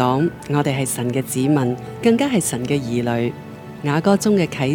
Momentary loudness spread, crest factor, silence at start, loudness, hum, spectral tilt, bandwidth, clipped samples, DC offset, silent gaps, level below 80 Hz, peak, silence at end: 7 LU; 16 dB; 0 s; -19 LUFS; none; -5.5 dB/octave; 18 kHz; under 0.1%; under 0.1%; none; -52 dBFS; -2 dBFS; 0 s